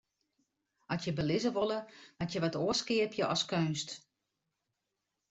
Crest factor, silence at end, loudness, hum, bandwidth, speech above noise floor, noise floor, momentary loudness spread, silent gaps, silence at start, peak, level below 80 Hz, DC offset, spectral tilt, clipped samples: 18 dB; 1.3 s; -34 LUFS; none; 8.2 kHz; 53 dB; -86 dBFS; 10 LU; none; 0.9 s; -18 dBFS; -68 dBFS; under 0.1%; -4.5 dB/octave; under 0.1%